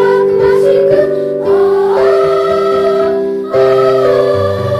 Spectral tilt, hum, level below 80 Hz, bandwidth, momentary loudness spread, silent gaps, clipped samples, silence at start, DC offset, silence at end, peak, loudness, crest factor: -7 dB/octave; none; -46 dBFS; 10 kHz; 4 LU; none; under 0.1%; 0 s; under 0.1%; 0 s; 0 dBFS; -10 LUFS; 10 dB